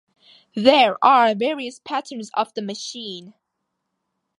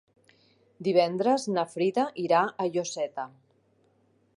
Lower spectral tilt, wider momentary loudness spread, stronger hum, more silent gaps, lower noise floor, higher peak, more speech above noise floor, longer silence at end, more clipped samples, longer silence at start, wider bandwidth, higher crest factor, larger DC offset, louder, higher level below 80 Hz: about the same, -4 dB/octave vs -5 dB/octave; first, 18 LU vs 9 LU; neither; neither; first, -78 dBFS vs -67 dBFS; first, 0 dBFS vs -10 dBFS; first, 58 dB vs 40 dB; about the same, 1.1 s vs 1.1 s; neither; second, 0.55 s vs 0.8 s; about the same, 11.5 kHz vs 11.5 kHz; about the same, 20 dB vs 20 dB; neither; first, -19 LUFS vs -27 LUFS; first, -70 dBFS vs -80 dBFS